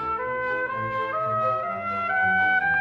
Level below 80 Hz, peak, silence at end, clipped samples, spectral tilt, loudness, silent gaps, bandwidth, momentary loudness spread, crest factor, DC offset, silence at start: -58 dBFS; -12 dBFS; 0 s; under 0.1%; -6.5 dB/octave; -24 LUFS; none; 6.6 kHz; 7 LU; 12 dB; under 0.1%; 0 s